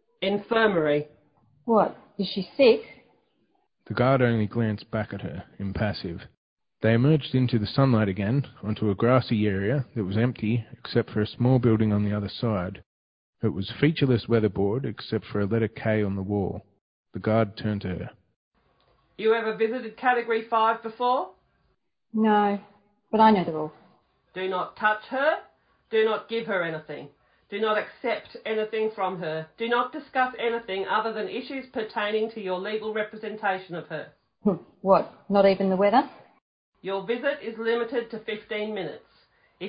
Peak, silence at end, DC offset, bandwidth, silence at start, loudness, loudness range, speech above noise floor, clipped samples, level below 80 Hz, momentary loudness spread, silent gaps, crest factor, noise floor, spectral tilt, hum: -6 dBFS; 0 s; under 0.1%; 5.2 kHz; 0.2 s; -26 LUFS; 4 LU; 47 dB; under 0.1%; -54 dBFS; 12 LU; 6.37-6.57 s, 12.86-13.33 s, 16.81-17.04 s, 18.36-18.51 s, 36.42-36.72 s; 20 dB; -72 dBFS; -11 dB/octave; none